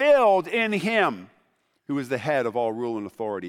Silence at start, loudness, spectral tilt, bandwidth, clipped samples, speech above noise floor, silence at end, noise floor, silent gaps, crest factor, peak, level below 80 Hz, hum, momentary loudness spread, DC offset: 0 s; -24 LUFS; -5.5 dB/octave; 14 kHz; under 0.1%; 44 dB; 0 s; -68 dBFS; none; 16 dB; -8 dBFS; -72 dBFS; none; 12 LU; under 0.1%